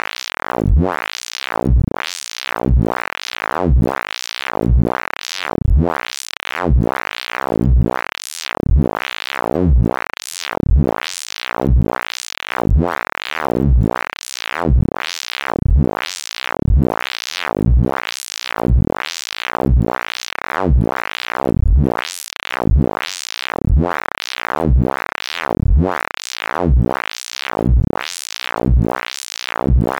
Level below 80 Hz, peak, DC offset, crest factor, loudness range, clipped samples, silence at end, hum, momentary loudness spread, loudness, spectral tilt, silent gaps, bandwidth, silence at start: -20 dBFS; -6 dBFS; under 0.1%; 12 dB; 0 LU; under 0.1%; 0 s; none; 8 LU; -19 LUFS; -5.5 dB/octave; none; 14.5 kHz; 0.55 s